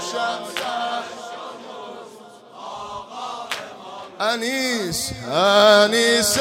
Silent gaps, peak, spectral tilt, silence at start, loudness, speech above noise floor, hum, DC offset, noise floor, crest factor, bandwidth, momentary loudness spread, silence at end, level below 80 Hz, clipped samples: none; 0 dBFS; -2 dB/octave; 0 s; -19 LUFS; 25 dB; none; under 0.1%; -43 dBFS; 20 dB; 16.5 kHz; 22 LU; 0 s; -56 dBFS; under 0.1%